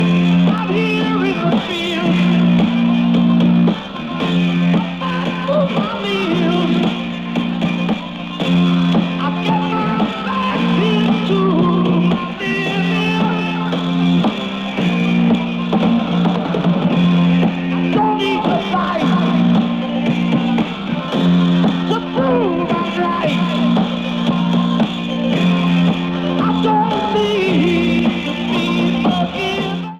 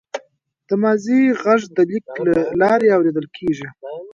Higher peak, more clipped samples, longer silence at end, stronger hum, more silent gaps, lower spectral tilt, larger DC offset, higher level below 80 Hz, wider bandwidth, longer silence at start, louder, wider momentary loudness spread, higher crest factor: about the same, -4 dBFS vs -2 dBFS; neither; about the same, 0 s vs 0 s; neither; neither; about the same, -7.5 dB/octave vs -7 dB/octave; neither; first, -46 dBFS vs -58 dBFS; about the same, 7.4 kHz vs 7.6 kHz; second, 0 s vs 0.15 s; about the same, -16 LUFS vs -17 LUFS; second, 5 LU vs 15 LU; second, 10 dB vs 16 dB